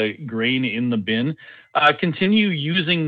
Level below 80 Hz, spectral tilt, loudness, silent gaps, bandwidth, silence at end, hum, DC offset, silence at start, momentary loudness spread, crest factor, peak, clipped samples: -64 dBFS; -7.5 dB/octave; -20 LUFS; none; 4.9 kHz; 0 s; none; under 0.1%; 0 s; 8 LU; 18 dB; -2 dBFS; under 0.1%